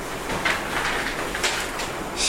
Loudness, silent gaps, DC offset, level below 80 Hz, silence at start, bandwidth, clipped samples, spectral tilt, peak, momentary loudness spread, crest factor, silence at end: -25 LUFS; none; under 0.1%; -40 dBFS; 0 s; 16.5 kHz; under 0.1%; -2 dB/octave; -8 dBFS; 5 LU; 18 dB; 0 s